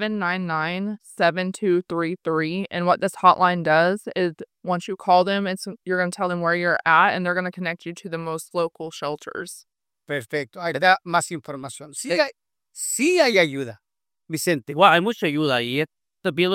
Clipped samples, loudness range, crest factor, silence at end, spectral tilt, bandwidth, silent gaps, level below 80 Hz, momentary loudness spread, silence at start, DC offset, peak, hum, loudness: under 0.1%; 5 LU; 22 dB; 0 s; -4 dB/octave; 16.5 kHz; none; -72 dBFS; 15 LU; 0 s; under 0.1%; -2 dBFS; none; -22 LUFS